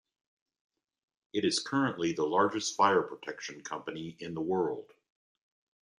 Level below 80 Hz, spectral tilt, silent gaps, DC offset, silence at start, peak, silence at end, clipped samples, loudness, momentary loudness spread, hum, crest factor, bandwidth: -76 dBFS; -4 dB/octave; none; under 0.1%; 1.35 s; -12 dBFS; 1.15 s; under 0.1%; -31 LUFS; 14 LU; none; 22 dB; 11 kHz